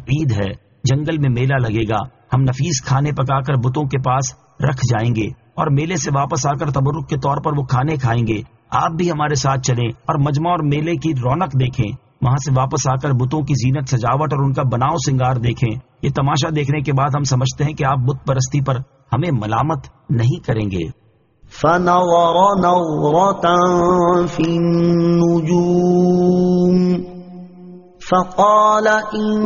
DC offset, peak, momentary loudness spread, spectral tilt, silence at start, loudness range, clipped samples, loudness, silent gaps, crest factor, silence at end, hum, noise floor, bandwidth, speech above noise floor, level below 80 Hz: under 0.1%; -2 dBFS; 8 LU; -6.5 dB/octave; 0 s; 4 LU; under 0.1%; -17 LUFS; none; 16 dB; 0 s; none; -49 dBFS; 7.4 kHz; 33 dB; -42 dBFS